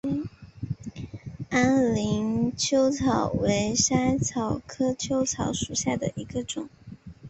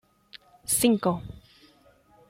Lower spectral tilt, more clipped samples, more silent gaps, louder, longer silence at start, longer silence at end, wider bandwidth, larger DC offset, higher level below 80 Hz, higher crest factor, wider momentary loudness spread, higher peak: about the same, -4.5 dB/octave vs -4 dB/octave; neither; neither; about the same, -26 LUFS vs -25 LUFS; second, 0.05 s vs 0.35 s; second, 0 s vs 1 s; second, 8.4 kHz vs 16.5 kHz; neither; first, -48 dBFS vs -56 dBFS; about the same, 20 dB vs 22 dB; about the same, 17 LU vs 19 LU; about the same, -6 dBFS vs -8 dBFS